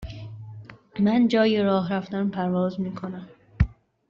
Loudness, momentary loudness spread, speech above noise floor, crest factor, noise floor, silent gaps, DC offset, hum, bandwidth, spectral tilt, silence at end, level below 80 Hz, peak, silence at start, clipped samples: -24 LUFS; 20 LU; 20 dB; 18 dB; -43 dBFS; none; under 0.1%; none; 7.2 kHz; -6 dB/octave; 0.35 s; -40 dBFS; -8 dBFS; 0 s; under 0.1%